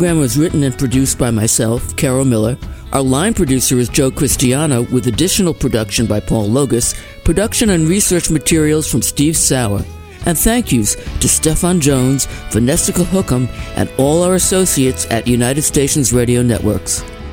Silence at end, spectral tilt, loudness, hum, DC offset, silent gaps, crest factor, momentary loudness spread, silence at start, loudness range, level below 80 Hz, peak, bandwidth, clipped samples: 0 s; -4.5 dB/octave; -14 LUFS; none; under 0.1%; none; 14 dB; 6 LU; 0 s; 1 LU; -28 dBFS; 0 dBFS; 17 kHz; under 0.1%